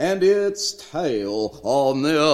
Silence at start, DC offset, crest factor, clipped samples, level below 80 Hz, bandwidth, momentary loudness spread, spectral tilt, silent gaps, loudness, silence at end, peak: 0 s; 0.1%; 16 dB; under 0.1%; -58 dBFS; 14.5 kHz; 8 LU; -4 dB/octave; none; -21 LUFS; 0 s; -4 dBFS